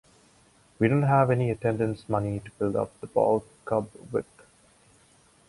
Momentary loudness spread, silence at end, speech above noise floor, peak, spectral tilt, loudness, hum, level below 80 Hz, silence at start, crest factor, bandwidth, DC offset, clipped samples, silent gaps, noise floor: 11 LU; 1.25 s; 34 dB; -8 dBFS; -8.5 dB/octave; -27 LUFS; none; -56 dBFS; 0.8 s; 20 dB; 11.5 kHz; under 0.1%; under 0.1%; none; -60 dBFS